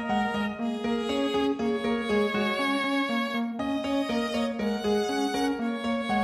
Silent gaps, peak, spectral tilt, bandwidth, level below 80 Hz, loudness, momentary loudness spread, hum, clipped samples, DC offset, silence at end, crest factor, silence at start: none; -14 dBFS; -5 dB/octave; 14 kHz; -56 dBFS; -28 LUFS; 4 LU; none; under 0.1%; under 0.1%; 0 s; 12 dB; 0 s